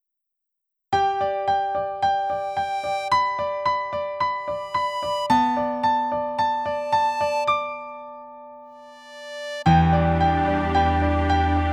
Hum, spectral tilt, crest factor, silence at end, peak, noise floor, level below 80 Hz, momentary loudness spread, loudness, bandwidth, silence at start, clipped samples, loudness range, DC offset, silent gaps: none; -6.5 dB/octave; 18 dB; 0 s; -4 dBFS; -81 dBFS; -36 dBFS; 15 LU; -22 LUFS; 12 kHz; 0.9 s; under 0.1%; 3 LU; under 0.1%; none